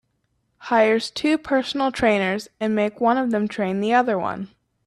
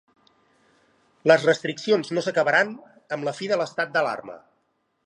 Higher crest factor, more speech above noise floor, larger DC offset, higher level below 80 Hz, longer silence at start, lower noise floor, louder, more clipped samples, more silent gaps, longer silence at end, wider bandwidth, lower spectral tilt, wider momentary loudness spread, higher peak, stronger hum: second, 16 dB vs 22 dB; about the same, 50 dB vs 49 dB; neither; first, -56 dBFS vs -78 dBFS; second, 0.6 s vs 1.25 s; about the same, -70 dBFS vs -71 dBFS; about the same, -21 LUFS vs -23 LUFS; neither; neither; second, 0.4 s vs 0.65 s; first, 13 kHz vs 11 kHz; about the same, -5.5 dB/octave vs -4.5 dB/octave; second, 7 LU vs 14 LU; second, -6 dBFS vs -2 dBFS; neither